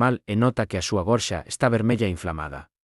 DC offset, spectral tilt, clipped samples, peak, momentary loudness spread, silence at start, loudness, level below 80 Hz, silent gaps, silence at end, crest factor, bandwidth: under 0.1%; -5.5 dB/octave; under 0.1%; -6 dBFS; 10 LU; 0 s; -24 LUFS; -48 dBFS; none; 0.3 s; 16 dB; 12 kHz